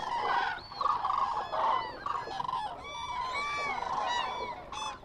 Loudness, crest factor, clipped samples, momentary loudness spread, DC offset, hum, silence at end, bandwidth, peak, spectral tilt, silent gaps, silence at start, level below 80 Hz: -33 LUFS; 16 dB; under 0.1%; 8 LU; under 0.1%; none; 0 s; 12 kHz; -18 dBFS; -2.5 dB/octave; none; 0 s; -58 dBFS